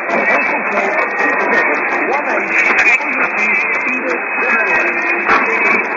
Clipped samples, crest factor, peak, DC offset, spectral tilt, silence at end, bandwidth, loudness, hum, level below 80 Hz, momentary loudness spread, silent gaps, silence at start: under 0.1%; 12 dB; -2 dBFS; under 0.1%; -4 dB/octave; 0 s; 7.8 kHz; -13 LUFS; none; -58 dBFS; 4 LU; none; 0 s